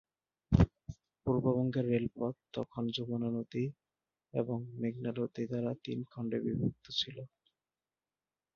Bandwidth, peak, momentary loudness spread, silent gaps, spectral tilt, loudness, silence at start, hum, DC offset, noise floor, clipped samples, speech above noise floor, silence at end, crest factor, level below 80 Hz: 7 kHz; -12 dBFS; 10 LU; none; -6.5 dB/octave; -36 LUFS; 0.5 s; none; under 0.1%; under -90 dBFS; under 0.1%; over 55 dB; 1.3 s; 24 dB; -50 dBFS